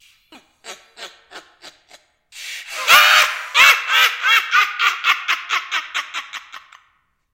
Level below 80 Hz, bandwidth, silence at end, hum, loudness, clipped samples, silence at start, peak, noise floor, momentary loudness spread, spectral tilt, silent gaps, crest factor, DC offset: -66 dBFS; 17 kHz; 0.75 s; none; -14 LUFS; under 0.1%; 0.65 s; 0 dBFS; -63 dBFS; 23 LU; 3 dB/octave; none; 20 dB; under 0.1%